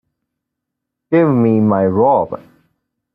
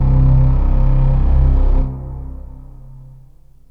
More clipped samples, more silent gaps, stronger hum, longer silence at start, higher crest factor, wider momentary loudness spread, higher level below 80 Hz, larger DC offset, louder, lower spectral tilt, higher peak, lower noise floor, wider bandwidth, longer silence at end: neither; neither; second, none vs 50 Hz at -50 dBFS; first, 1.1 s vs 0 s; about the same, 14 dB vs 12 dB; second, 8 LU vs 19 LU; second, -58 dBFS vs -14 dBFS; second, under 0.1% vs 0.5%; about the same, -14 LUFS vs -16 LUFS; about the same, -12 dB/octave vs -11.5 dB/octave; about the same, -2 dBFS vs -2 dBFS; first, -79 dBFS vs -45 dBFS; first, 4 kHz vs 2.6 kHz; first, 0.8 s vs 0.65 s